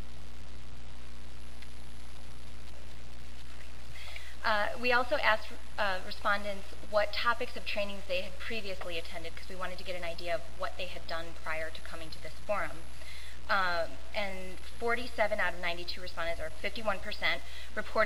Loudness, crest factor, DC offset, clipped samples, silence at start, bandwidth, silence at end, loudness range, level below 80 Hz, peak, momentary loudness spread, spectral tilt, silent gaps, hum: -34 LUFS; 26 dB; 3%; under 0.1%; 0 s; 16 kHz; 0 s; 12 LU; -50 dBFS; -10 dBFS; 20 LU; -3.5 dB/octave; none; none